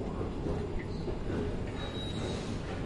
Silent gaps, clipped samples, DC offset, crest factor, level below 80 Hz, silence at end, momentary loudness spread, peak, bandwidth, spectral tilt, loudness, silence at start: none; under 0.1%; under 0.1%; 12 dB; -42 dBFS; 0 s; 2 LU; -22 dBFS; 11 kHz; -6.5 dB/octave; -37 LUFS; 0 s